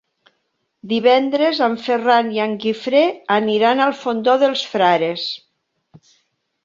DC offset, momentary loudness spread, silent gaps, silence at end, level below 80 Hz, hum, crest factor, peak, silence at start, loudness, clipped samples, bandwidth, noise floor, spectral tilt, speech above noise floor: under 0.1%; 7 LU; none; 1.3 s; -68 dBFS; none; 16 dB; -2 dBFS; 0.85 s; -17 LUFS; under 0.1%; 7.6 kHz; -70 dBFS; -5 dB/octave; 54 dB